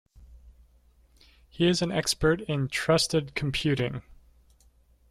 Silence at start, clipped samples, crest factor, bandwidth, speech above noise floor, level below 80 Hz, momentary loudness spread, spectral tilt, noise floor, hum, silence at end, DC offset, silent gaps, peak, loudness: 0.2 s; under 0.1%; 20 dB; 15 kHz; 35 dB; -50 dBFS; 6 LU; -4.5 dB/octave; -61 dBFS; none; 0.95 s; under 0.1%; none; -10 dBFS; -26 LUFS